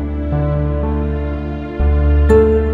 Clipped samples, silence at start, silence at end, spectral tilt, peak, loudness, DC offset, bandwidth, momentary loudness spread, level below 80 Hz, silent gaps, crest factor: under 0.1%; 0 s; 0 s; -10 dB/octave; 0 dBFS; -16 LUFS; 0.2%; 4.1 kHz; 11 LU; -18 dBFS; none; 14 dB